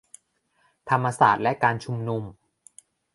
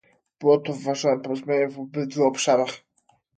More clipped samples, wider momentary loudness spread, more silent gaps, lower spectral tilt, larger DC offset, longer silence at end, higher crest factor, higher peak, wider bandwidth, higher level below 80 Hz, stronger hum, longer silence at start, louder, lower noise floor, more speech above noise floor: neither; first, 15 LU vs 9 LU; neither; first, -6 dB/octave vs -4.5 dB/octave; neither; first, 0.85 s vs 0.6 s; about the same, 22 dB vs 18 dB; about the same, -4 dBFS vs -6 dBFS; first, 11.5 kHz vs 9.2 kHz; first, -62 dBFS vs -74 dBFS; neither; first, 0.85 s vs 0.4 s; about the same, -23 LUFS vs -24 LUFS; about the same, -68 dBFS vs -65 dBFS; about the same, 45 dB vs 43 dB